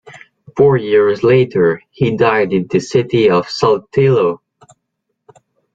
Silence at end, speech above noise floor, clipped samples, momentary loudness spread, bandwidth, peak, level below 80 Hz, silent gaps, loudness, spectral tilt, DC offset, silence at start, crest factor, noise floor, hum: 1.4 s; 60 dB; under 0.1%; 6 LU; 7.8 kHz; -2 dBFS; -52 dBFS; none; -14 LUFS; -7 dB/octave; under 0.1%; 0.05 s; 14 dB; -72 dBFS; none